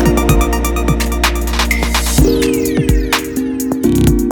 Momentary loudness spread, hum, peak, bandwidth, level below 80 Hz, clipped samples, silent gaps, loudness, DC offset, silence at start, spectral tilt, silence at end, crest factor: 4 LU; none; 0 dBFS; 19.5 kHz; -18 dBFS; under 0.1%; none; -14 LUFS; under 0.1%; 0 s; -5 dB/octave; 0 s; 12 dB